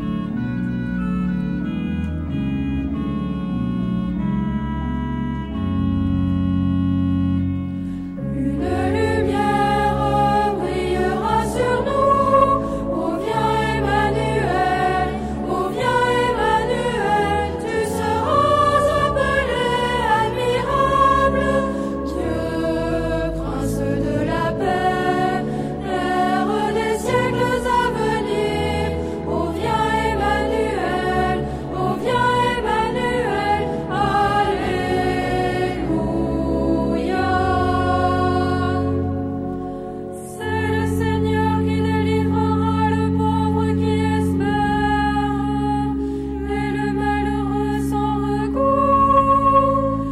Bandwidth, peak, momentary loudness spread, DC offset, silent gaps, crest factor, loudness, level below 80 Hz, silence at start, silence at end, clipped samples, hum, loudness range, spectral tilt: 14 kHz; -4 dBFS; 7 LU; under 0.1%; none; 16 dB; -20 LUFS; -34 dBFS; 0 s; 0 s; under 0.1%; none; 4 LU; -6.5 dB/octave